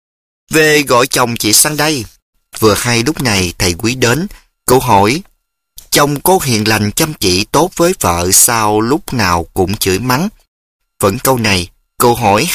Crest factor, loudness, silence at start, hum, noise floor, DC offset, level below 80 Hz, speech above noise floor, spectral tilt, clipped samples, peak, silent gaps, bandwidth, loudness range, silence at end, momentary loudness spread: 12 dB; -11 LUFS; 0.5 s; none; -50 dBFS; under 0.1%; -36 dBFS; 38 dB; -3.5 dB/octave; 0.1%; 0 dBFS; 2.22-2.33 s, 10.48-10.80 s; over 20 kHz; 3 LU; 0 s; 8 LU